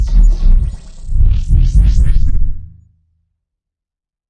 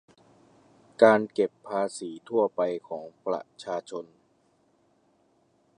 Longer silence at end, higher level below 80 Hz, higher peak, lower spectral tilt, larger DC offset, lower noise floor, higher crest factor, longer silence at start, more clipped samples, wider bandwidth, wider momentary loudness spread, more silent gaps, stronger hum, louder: about the same, 1.65 s vs 1.75 s; first, -12 dBFS vs -80 dBFS; first, 0 dBFS vs -4 dBFS; first, -7.5 dB/octave vs -5 dB/octave; neither; first, -86 dBFS vs -67 dBFS; second, 10 dB vs 26 dB; second, 0 s vs 1 s; neither; second, 7.2 kHz vs 10.5 kHz; second, 12 LU vs 19 LU; neither; neither; first, -16 LUFS vs -27 LUFS